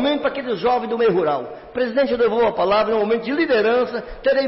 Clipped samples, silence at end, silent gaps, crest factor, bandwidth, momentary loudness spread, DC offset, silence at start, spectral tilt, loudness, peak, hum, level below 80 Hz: under 0.1%; 0 s; none; 10 dB; 5.8 kHz; 6 LU; under 0.1%; 0 s; -9.5 dB/octave; -19 LUFS; -10 dBFS; none; -48 dBFS